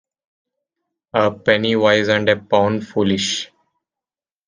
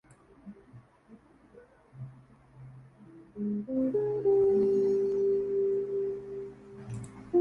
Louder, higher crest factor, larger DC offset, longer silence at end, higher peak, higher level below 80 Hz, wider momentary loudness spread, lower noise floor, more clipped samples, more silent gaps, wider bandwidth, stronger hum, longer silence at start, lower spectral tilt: first, -17 LUFS vs -29 LUFS; about the same, 20 dB vs 16 dB; neither; first, 1 s vs 0 s; first, 0 dBFS vs -16 dBFS; about the same, -60 dBFS vs -64 dBFS; second, 7 LU vs 25 LU; first, under -90 dBFS vs -57 dBFS; neither; neither; first, 9.8 kHz vs 8.6 kHz; neither; first, 1.15 s vs 0.45 s; second, -4.5 dB/octave vs -9.5 dB/octave